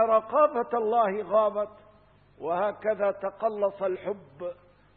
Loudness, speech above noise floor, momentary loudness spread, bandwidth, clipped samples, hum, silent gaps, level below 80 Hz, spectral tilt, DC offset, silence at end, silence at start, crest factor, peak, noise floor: -27 LUFS; 31 dB; 13 LU; 4.2 kHz; under 0.1%; none; none; -68 dBFS; -9.5 dB/octave; under 0.1%; 0.45 s; 0 s; 18 dB; -10 dBFS; -58 dBFS